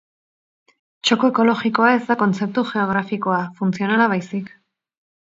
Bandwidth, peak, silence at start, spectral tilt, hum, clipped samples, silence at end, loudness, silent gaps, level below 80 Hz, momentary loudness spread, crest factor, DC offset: 7.8 kHz; -2 dBFS; 1.05 s; -5.5 dB/octave; none; under 0.1%; 0.75 s; -19 LUFS; none; -66 dBFS; 7 LU; 18 dB; under 0.1%